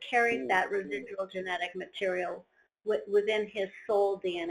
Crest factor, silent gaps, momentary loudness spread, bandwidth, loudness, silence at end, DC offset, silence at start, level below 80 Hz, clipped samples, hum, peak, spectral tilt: 18 dB; none; 10 LU; 11 kHz; -31 LUFS; 0 s; under 0.1%; 0 s; -72 dBFS; under 0.1%; none; -12 dBFS; -4.5 dB/octave